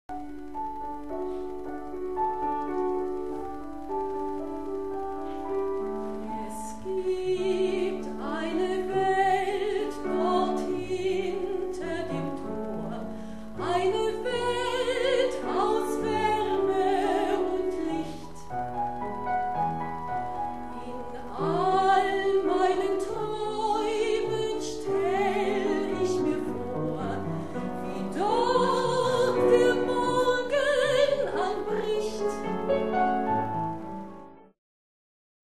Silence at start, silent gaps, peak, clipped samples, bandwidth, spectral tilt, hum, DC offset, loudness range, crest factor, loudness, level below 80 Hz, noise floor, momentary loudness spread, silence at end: 0.1 s; none; -10 dBFS; under 0.1%; 13 kHz; -5.5 dB/octave; none; 0.9%; 7 LU; 18 dB; -28 LUFS; -54 dBFS; under -90 dBFS; 12 LU; 0.85 s